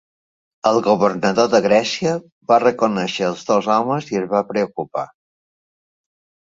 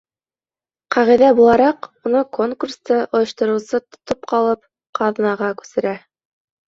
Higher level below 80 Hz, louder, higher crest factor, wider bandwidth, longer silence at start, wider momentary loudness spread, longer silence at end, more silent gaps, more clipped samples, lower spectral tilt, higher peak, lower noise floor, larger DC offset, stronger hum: about the same, -60 dBFS vs -56 dBFS; about the same, -18 LUFS vs -17 LUFS; about the same, 18 dB vs 16 dB; about the same, 7.8 kHz vs 7.6 kHz; second, 0.65 s vs 0.9 s; second, 9 LU vs 14 LU; first, 1.45 s vs 0.7 s; about the same, 2.32-2.41 s vs 4.89-4.93 s; neither; about the same, -5 dB/octave vs -5.5 dB/octave; about the same, 0 dBFS vs -2 dBFS; about the same, under -90 dBFS vs under -90 dBFS; neither; neither